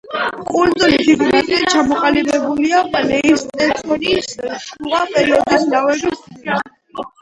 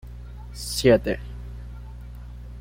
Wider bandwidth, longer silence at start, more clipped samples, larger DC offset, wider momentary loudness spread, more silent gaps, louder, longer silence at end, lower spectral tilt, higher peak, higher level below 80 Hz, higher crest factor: second, 11.5 kHz vs 16.5 kHz; about the same, 0.05 s vs 0.05 s; neither; neither; second, 12 LU vs 22 LU; neither; first, -15 LUFS vs -22 LUFS; first, 0.15 s vs 0 s; second, -3.5 dB/octave vs -5 dB/octave; first, 0 dBFS vs -6 dBFS; second, -46 dBFS vs -38 dBFS; second, 16 dB vs 22 dB